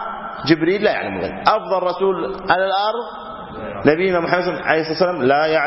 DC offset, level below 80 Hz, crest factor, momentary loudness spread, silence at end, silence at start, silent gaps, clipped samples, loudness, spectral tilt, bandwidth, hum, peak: under 0.1%; -50 dBFS; 18 dB; 12 LU; 0 s; 0 s; none; under 0.1%; -18 LUFS; -8 dB/octave; 5.8 kHz; none; 0 dBFS